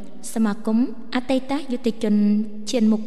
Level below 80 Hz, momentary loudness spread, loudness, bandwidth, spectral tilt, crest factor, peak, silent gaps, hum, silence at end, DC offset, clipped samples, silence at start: -60 dBFS; 7 LU; -23 LUFS; 12.5 kHz; -6 dB/octave; 12 dB; -8 dBFS; none; none; 0 s; 4%; under 0.1%; 0 s